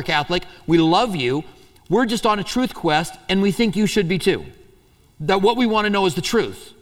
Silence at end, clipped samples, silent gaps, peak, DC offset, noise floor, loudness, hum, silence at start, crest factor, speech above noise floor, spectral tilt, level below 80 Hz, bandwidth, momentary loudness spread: 0.1 s; under 0.1%; none; -4 dBFS; under 0.1%; -53 dBFS; -20 LUFS; none; 0 s; 16 dB; 34 dB; -5 dB/octave; -44 dBFS; 16.5 kHz; 6 LU